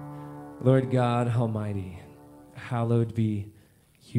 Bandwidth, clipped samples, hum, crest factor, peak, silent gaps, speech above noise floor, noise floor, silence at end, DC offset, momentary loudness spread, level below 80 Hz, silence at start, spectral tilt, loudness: 10.5 kHz; under 0.1%; none; 20 dB; -8 dBFS; none; 33 dB; -58 dBFS; 0 s; under 0.1%; 20 LU; -62 dBFS; 0 s; -8.5 dB/octave; -27 LUFS